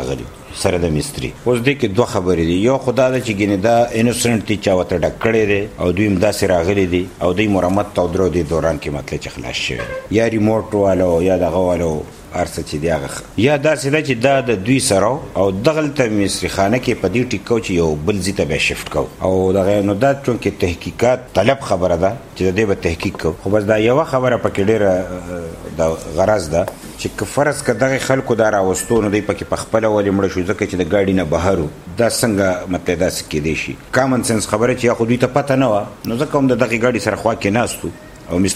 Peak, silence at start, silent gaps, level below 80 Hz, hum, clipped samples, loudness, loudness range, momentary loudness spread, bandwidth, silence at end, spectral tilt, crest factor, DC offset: 0 dBFS; 0 s; none; -38 dBFS; none; under 0.1%; -17 LUFS; 2 LU; 7 LU; 16 kHz; 0 s; -5.5 dB/octave; 16 dB; under 0.1%